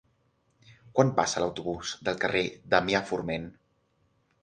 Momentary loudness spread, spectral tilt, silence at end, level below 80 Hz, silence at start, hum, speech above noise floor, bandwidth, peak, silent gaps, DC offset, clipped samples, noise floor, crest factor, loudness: 9 LU; -4.5 dB/octave; 0.9 s; -58 dBFS; 0.7 s; none; 43 dB; 9.8 kHz; -6 dBFS; none; under 0.1%; under 0.1%; -70 dBFS; 24 dB; -28 LUFS